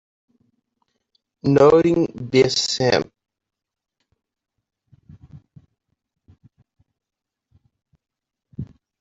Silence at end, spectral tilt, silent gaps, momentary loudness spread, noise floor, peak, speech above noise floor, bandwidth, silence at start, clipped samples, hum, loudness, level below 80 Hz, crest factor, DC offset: 0.35 s; -5 dB/octave; none; 23 LU; -85 dBFS; -2 dBFS; 69 dB; 8 kHz; 1.45 s; under 0.1%; none; -17 LUFS; -56 dBFS; 22 dB; under 0.1%